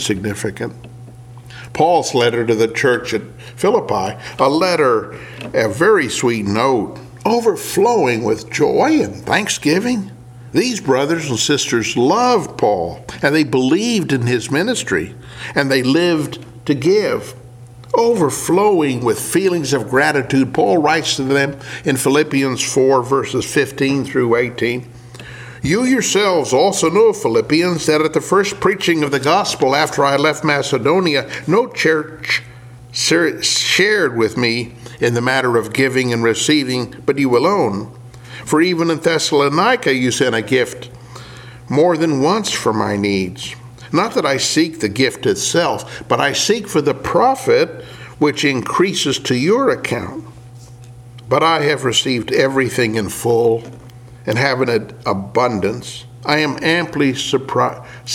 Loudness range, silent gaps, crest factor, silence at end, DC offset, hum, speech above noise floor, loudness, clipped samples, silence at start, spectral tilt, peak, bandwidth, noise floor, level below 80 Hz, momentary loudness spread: 3 LU; none; 16 dB; 0 s; under 0.1%; none; 22 dB; -16 LUFS; under 0.1%; 0 s; -4 dB/octave; 0 dBFS; 17 kHz; -37 dBFS; -50 dBFS; 10 LU